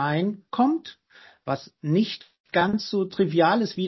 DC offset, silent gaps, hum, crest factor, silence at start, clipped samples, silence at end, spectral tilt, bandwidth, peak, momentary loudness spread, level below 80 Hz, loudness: under 0.1%; 2.40-2.44 s; none; 18 dB; 0 s; under 0.1%; 0 s; -7 dB/octave; 6 kHz; -6 dBFS; 10 LU; -66 dBFS; -24 LUFS